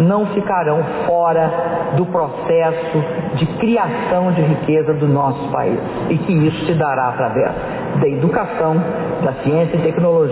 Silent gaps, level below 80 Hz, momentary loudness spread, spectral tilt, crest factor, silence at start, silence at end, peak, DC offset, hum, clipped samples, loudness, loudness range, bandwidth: none; -46 dBFS; 4 LU; -12 dB/octave; 12 dB; 0 s; 0 s; -4 dBFS; under 0.1%; none; under 0.1%; -17 LUFS; 1 LU; 4 kHz